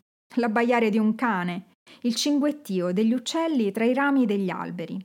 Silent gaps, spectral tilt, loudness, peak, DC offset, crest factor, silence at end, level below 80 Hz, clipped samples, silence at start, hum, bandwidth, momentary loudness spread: 1.75-1.86 s; -5 dB/octave; -24 LUFS; -10 dBFS; under 0.1%; 14 dB; 0 s; -84 dBFS; under 0.1%; 0.3 s; none; 17 kHz; 10 LU